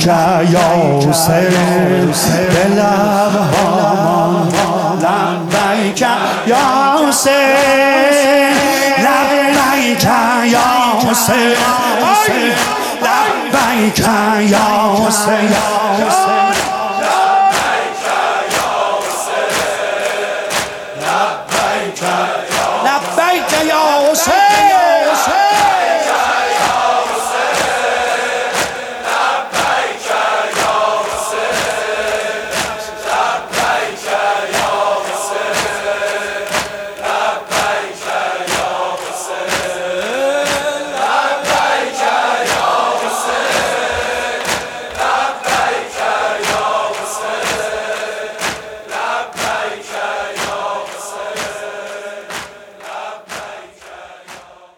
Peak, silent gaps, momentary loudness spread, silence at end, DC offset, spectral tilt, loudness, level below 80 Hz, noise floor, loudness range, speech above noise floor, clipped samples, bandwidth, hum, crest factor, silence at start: 0 dBFS; none; 10 LU; 0.25 s; under 0.1%; -3.5 dB/octave; -13 LUFS; -48 dBFS; -37 dBFS; 8 LU; 26 dB; under 0.1%; 19 kHz; none; 14 dB; 0 s